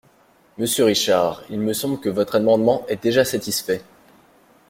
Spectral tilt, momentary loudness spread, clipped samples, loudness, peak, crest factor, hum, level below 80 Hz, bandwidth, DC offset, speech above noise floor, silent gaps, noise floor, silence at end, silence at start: -4 dB/octave; 8 LU; under 0.1%; -20 LUFS; -4 dBFS; 18 dB; none; -58 dBFS; 16.5 kHz; under 0.1%; 36 dB; none; -56 dBFS; 0.9 s; 0.6 s